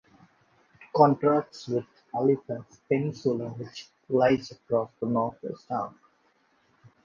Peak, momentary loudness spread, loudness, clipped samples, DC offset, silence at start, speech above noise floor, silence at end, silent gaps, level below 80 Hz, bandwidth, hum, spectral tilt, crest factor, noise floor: -6 dBFS; 16 LU; -27 LUFS; under 0.1%; under 0.1%; 0.8 s; 40 dB; 1.15 s; none; -68 dBFS; 7.4 kHz; none; -7.5 dB/octave; 22 dB; -67 dBFS